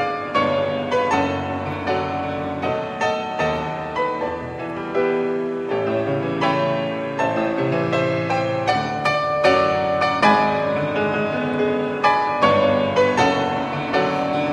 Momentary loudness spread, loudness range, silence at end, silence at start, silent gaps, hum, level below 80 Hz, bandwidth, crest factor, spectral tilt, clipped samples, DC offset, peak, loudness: 8 LU; 5 LU; 0 s; 0 s; none; none; -52 dBFS; 10.5 kHz; 18 dB; -6 dB/octave; under 0.1%; under 0.1%; -2 dBFS; -20 LUFS